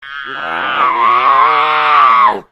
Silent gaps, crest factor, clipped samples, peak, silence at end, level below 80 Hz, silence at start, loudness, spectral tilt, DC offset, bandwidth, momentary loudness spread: none; 12 dB; under 0.1%; 0 dBFS; 0.1 s; -56 dBFS; 0 s; -10 LUFS; -3.5 dB/octave; under 0.1%; 7.6 kHz; 12 LU